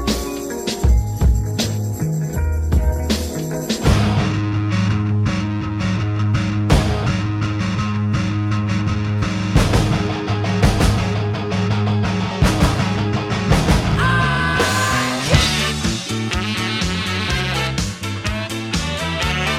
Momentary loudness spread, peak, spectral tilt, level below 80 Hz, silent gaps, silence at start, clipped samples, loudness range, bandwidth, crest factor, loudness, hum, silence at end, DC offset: 6 LU; 0 dBFS; -5 dB/octave; -26 dBFS; none; 0 s; under 0.1%; 3 LU; 15.5 kHz; 18 dB; -19 LUFS; none; 0 s; under 0.1%